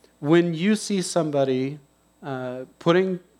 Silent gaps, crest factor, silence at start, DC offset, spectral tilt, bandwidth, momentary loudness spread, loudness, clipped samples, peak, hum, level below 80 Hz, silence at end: none; 18 dB; 0.2 s; under 0.1%; -5.5 dB/octave; 13 kHz; 14 LU; -23 LUFS; under 0.1%; -6 dBFS; none; -70 dBFS; 0.2 s